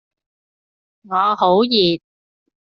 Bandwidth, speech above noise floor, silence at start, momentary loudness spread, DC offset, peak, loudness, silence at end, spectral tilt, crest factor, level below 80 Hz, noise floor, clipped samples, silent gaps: 6.4 kHz; over 74 dB; 1.1 s; 9 LU; under 0.1%; -2 dBFS; -16 LUFS; 0.8 s; -3 dB/octave; 18 dB; -64 dBFS; under -90 dBFS; under 0.1%; none